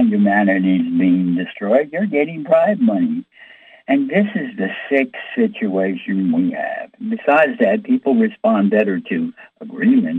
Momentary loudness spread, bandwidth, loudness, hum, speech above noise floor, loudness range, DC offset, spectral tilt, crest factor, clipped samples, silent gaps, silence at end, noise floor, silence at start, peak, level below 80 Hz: 9 LU; 4 kHz; -17 LUFS; none; 27 dB; 3 LU; under 0.1%; -9.5 dB/octave; 14 dB; under 0.1%; none; 0 s; -44 dBFS; 0 s; -2 dBFS; -70 dBFS